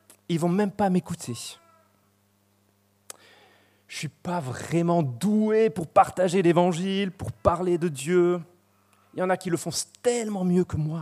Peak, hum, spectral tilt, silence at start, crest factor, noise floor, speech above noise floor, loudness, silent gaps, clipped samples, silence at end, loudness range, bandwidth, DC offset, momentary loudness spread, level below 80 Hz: -4 dBFS; none; -6 dB/octave; 0.3 s; 22 dB; -66 dBFS; 41 dB; -25 LUFS; none; under 0.1%; 0 s; 13 LU; 15 kHz; under 0.1%; 14 LU; -54 dBFS